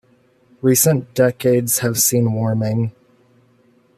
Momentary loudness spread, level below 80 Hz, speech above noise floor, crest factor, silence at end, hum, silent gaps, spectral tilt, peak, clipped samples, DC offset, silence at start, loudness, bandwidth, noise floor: 7 LU; -58 dBFS; 39 dB; 16 dB; 1.1 s; none; none; -5 dB/octave; -2 dBFS; under 0.1%; under 0.1%; 0.65 s; -17 LUFS; 15 kHz; -56 dBFS